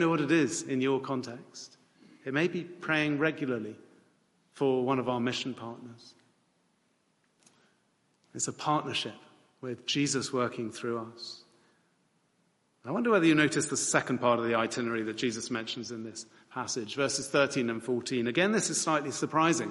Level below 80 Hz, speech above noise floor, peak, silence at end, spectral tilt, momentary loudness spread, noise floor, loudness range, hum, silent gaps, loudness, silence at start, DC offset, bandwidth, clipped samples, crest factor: -74 dBFS; 42 dB; -8 dBFS; 0 s; -4 dB/octave; 16 LU; -72 dBFS; 8 LU; none; none; -30 LUFS; 0 s; under 0.1%; 11.5 kHz; under 0.1%; 22 dB